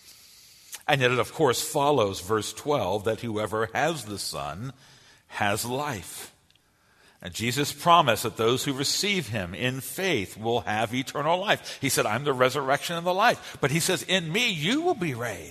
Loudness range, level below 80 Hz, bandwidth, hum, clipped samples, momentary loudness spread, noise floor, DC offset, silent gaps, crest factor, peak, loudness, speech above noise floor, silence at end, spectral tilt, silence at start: 6 LU; -60 dBFS; 13.5 kHz; none; under 0.1%; 10 LU; -63 dBFS; under 0.1%; none; 22 dB; -4 dBFS; -26 LUFS; 37 dB; 0 s; -3.5 dB/octave; 0.05 s